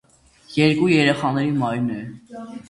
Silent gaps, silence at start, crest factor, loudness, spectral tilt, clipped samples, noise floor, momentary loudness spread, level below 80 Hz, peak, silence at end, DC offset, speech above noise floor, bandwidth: none; 0.5 s; 18 dB; -19 LUFS; -6.5 dB/octave; under 0.1%; -50 dBFS; 20 LU; -56 dBFS; -2 dBFS; 0.1 s; under 0.1%; 30 dB; 11.5 kHz